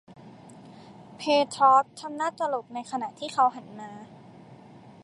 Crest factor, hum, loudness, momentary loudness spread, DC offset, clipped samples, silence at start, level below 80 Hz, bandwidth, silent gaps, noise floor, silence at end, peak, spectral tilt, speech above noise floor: 20 dB; none; -25 LUFS; 22 LU; under 0.1%; under 0.1%; 0.1 s; -76 dBFS; 11.5 kHz; none; -49 dBFS; 0.5 s; -8 dBFS; -4 dB/octave; 24 dB